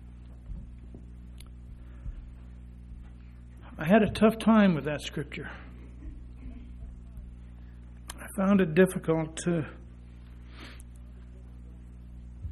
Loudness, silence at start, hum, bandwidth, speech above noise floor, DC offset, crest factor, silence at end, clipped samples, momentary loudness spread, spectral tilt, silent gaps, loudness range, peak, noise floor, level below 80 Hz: -26 LUFS; 0 s; 60 Hz at -45 dBFS; 13 kHz; 22 dB; under 0.1%; 22 dB; 0 s; under 0.1%; 25 LU; -6.5 dB/octave; none; 17 LU; -10 dBFS; -47 dBFS; -46 dBFS